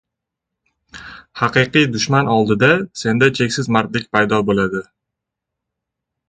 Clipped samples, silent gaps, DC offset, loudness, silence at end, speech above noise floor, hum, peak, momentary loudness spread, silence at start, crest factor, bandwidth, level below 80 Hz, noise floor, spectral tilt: under 0.1%; none; under 0.1%; -16 LUFS; 1.5 s; 65 dB; none; 0 dBFS; 14 LU; 0.95 s; 18 dB; 9.4 kHz; -50 dBFS; -81 dBFS; -5 dB/octave